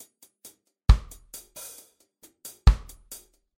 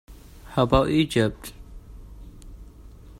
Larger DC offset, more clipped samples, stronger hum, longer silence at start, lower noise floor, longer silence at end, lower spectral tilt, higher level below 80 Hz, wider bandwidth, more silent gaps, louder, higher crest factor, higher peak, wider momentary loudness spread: neither; neither; neither; first, 0.9 s vs 0.1 s; first, -59 dBFS vs -45 dBFS; first, 0.85 s vs 0.1 s; about the same, -5.5 dB/octave vs -6.5 dB/octave; first, -28 dBFS vs -40 dBFS; about the same, 16.5 kHz vs 16 kHz; neither; second, -25 LUFS vs -22 LUFS; about the same, 22 dB vs 22 dB; about the same, -4 dBFS vs -4 dBFS; second, 23 LU vs 26 LU